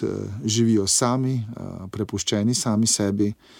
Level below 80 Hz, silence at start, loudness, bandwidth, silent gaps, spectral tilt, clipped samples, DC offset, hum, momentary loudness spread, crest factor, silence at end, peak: -56 dBFS; 0 s; -22 LUFS; 17 kHz; none; -4.5 dB/octave; under 0.1%; under 0.1%; none; 12 LU; 16 dB; 0.25 s; -6 dBFS